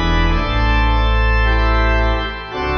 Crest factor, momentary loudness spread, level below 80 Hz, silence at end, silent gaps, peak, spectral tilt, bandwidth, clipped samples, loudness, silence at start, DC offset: 10 dB; 5 LU; -16 dBFS; 0 s; none; -4 dBFS; -6.5 dB/octave; 6.6 kHz; under 0.1%; -17 LUFS; 0 s; under 0.1%